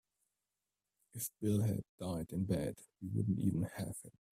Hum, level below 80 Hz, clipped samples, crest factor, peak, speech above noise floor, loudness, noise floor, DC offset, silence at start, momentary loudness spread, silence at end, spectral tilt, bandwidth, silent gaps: 50 Hz at -55 dBFS; -64 dBFS; under 0.1%; 18 dB; -22 dBFS; over 52 dB; -39 LUFS; under -90 dBFS; under 0.1%; 1.15 s; 10 LU; 0.3 s; -7 dB/octave; 16 kHz; 1.89-1.98 s